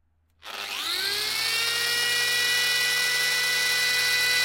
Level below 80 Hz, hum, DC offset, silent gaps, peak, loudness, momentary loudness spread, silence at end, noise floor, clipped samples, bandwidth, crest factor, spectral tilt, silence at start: -72 dBFS; none; under 0.1%; none; -12 dBFS; -22 LUFS; 7 LU; 0 s; -48 dBFS; under 0.1%; 16.5 kHz; 14 dB; 1.5 dB/octave; 0.45 s